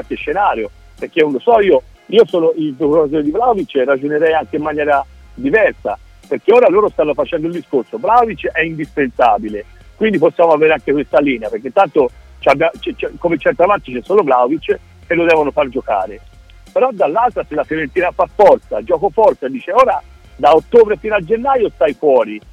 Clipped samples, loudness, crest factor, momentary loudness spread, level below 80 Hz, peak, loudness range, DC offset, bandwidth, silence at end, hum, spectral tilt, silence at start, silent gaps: under 0.1%; -14 LUFS; 14 dB; 9 LU; -42 dBFS; 0 dBFS; 2 LU; under 0.1%; 8.8 kHz; 0.15 s; none; -6.5 dB/octave; 0 s; none